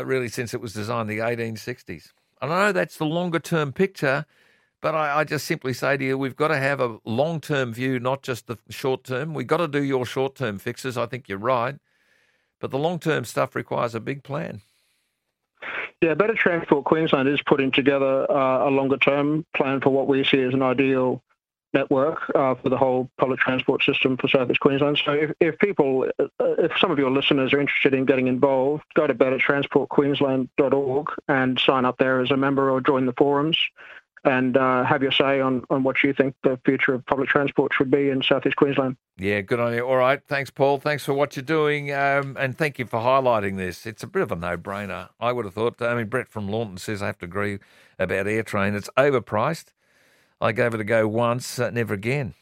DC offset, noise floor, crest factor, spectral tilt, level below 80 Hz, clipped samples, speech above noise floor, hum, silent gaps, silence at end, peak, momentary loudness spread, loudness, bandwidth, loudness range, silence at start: under 0.1%; -77 dBFS; 20 dB; -6 dB/octave; -60 dBFS; under 0.1%; 55 dB; none; none; 0.1 s; -4 dBFS; 9 LU; -22 LUFS; 16 kHz; 6 LU; 0 s